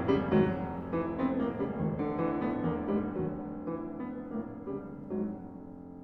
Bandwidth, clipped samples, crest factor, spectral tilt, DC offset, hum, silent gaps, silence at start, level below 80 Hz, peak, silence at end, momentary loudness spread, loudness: 6 kHz; under 0.1%; 20 dB; -10 dB/octave; under 0.1%; none; none; 0 s; -54 dBFS; -14 dBFS; 0 s; 12 LU; -33 LUFS